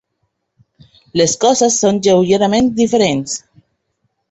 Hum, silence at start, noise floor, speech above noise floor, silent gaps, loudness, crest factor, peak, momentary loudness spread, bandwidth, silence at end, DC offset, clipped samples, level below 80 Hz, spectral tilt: none; 1.15 s; -69 dBFS; 56 dB; none; -14 LUFS; 16 dB; 0 dBFS; 9 LU; 8.4 kHz; 0.95 s; under 0.1%; under 0.1%; -50 dBFS; -4 dB/octave